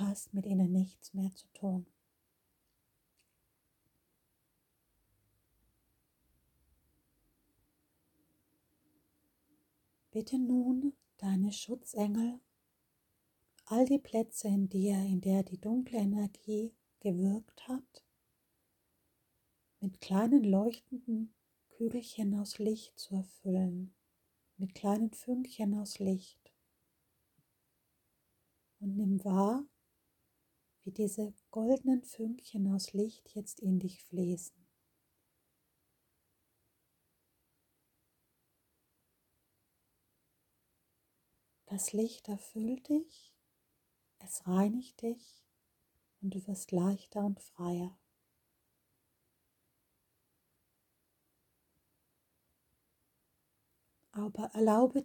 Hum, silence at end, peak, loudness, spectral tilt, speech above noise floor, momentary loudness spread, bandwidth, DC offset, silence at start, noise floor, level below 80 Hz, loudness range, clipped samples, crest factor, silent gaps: none; 0 s; -16 dBFS; -35 LUFS; -6.5 dB/octave; 46 dB; 12 LU; 18 kHz; under 0.1%; 0 s; -80 dBFS; -78 dBFS; 9 LU; under 0.1%; 22 dB; none